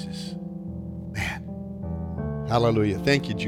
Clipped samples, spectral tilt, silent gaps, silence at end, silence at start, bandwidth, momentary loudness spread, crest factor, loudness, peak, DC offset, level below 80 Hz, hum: under 0.1%; -6.5 dB/octave; none; 0 s; 0 s; 15.5 kHz; 13 LU; 20 dB; -27 LUFS; -8 dBFS; under 0.1%; -44 dBFS; none